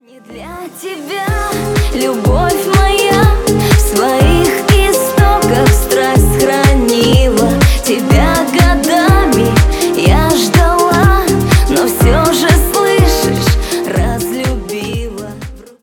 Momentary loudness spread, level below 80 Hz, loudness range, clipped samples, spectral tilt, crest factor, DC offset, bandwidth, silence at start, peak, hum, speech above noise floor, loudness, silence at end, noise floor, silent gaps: 10 LU; -16 dBFS; 3 LU; under 0.1%; -5 dB/octave; 10 dB; under 0.1%; 19 kHz; 0.3 s; 0 dBFS; none; 18 dB; -11 LUFS; 0.2 s; -31 dBFS; none